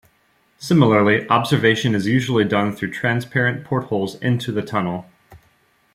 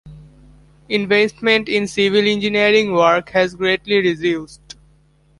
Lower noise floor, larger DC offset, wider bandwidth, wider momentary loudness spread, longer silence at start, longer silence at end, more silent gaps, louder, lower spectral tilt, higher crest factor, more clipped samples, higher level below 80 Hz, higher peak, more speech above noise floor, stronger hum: first, -61 dBFS vs -54 dBFS; neither; first, 15.5 kHz vs 11.5 kHz; about the same, 9 LU vs 8 LU; first, 0.6 s vs 0.05 s; second, 0.55 s vs 0.85 s; neither; second, -19 LUFS vs -16 LUFS; first, -6.5 dB/octave vs -4.5 dB/octave; about the same, 18 dB vs 16 dB; neither; second, -58 dBFS vs -50 dBFS; about the same, -2 dBFS vs -2 dBFS; first, 42 dB vs 38 dB; neither